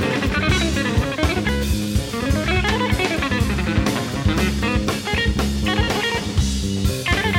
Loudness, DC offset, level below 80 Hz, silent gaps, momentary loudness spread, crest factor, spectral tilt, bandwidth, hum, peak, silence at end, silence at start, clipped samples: -20 LUFS; under 0.1%; -26 dBFS; none; 3 LU; 14 dB; -5 dB/octave; 19.5 kHz; none; -4 dBFS; 0 s; 0 s; under 0.1%